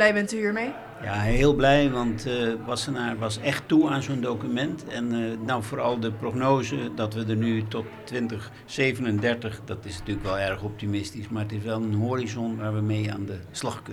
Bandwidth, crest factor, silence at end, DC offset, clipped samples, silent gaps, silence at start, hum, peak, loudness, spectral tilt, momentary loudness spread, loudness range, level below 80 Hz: 13 kHz; 20 dB; 0 s; under 0.1%; under 0.1%; none; 0 s; none; -6 dBFS; -27 LUFS; -6 dB/octave; 11 LU; 5 LU; -42 dBFS